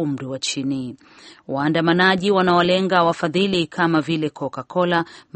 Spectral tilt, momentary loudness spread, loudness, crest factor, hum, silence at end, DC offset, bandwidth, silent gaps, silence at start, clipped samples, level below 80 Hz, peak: -5 dB/octave; 10 LU; -19 LUFS; 18 dB; none; 0.15 s; under 0.1%; 8.8 kHz; none; 0 s; under 0.1%; -58 dBFS; -2 dBFS